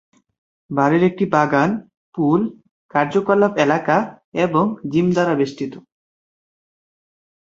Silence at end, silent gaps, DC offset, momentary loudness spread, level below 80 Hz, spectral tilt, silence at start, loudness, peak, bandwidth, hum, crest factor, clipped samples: 1.7 s; 1.97-2.12 s, 2.71-2.89 s, 4.24-4.32 s; under 0.1%; 11 LU; -60 dBFS; -7 dB/octave; 0.7 s; -18 LUFS; -2 dBFS; 7.6 kHz; none; 18 dB; under 0.1%